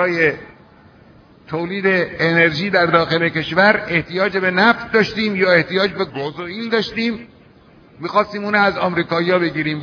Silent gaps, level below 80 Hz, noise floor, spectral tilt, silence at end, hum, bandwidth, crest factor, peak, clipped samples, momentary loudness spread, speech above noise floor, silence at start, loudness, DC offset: none; -52 dBFS; -47 dBFS; -6.5 dB/octave; 0 s; none; 5.4 kHz; 18 dB; 0 dBFS; under 0.1%; 10 LU; 30 dB; 0 s; -17 LUFS; under 0.1%